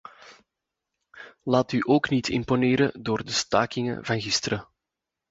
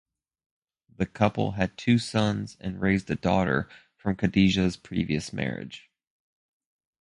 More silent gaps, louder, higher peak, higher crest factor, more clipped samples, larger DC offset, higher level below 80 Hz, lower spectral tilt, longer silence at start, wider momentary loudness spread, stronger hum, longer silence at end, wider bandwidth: neither; about the same, -25 LUFS vs -27 LUFS; about the same, -6 dBFS vs -6 dBFS; about the same, 22 dB vs 22 dB; neither; neither; second, -56 dBFS vs -48 dBFS; second, -4.5 dB/octave vs -6.5 dB/octave; second, 0.25 s vs 1 s; second, 7 LU vs 11 LU; neither; second, 0.7 s vs 1.2 s; second, 8 kHz vs 11 kHz